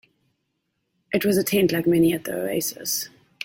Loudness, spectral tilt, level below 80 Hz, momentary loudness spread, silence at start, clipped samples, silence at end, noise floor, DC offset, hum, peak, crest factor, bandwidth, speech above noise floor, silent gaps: -22 LUFS; -4.5 dB/octave; -58 dBFS; 8 LU; 1.1 s; under 0.1%; 0.4 s; -75 dBFS; under 0.1%; none; -8 dBFS; 16 dB; 17 kHz; 54 dB; none